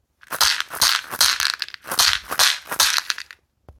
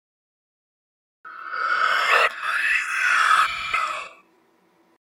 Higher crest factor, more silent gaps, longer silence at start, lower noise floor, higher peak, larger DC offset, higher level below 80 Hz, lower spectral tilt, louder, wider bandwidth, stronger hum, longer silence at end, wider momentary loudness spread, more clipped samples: about the same, 22 dB vs 20 dB; neither; second, 0.3 s vs 1.25 s; second, -47 dBFS vs -61 dBFS; first, 0 dBFS vs -4 dBFS; neither; first, -52 dBFS vs -64 dBFS; about the same, 2 dB/octave vs 1 dB/octave; about the same, -18 LUFS vs -20 LUFS; about the same, 19 kHz vs 17.5 kHz; neither; second, 0.1 s vs 0.95 s; second, 10 LU vs 15 LU; neither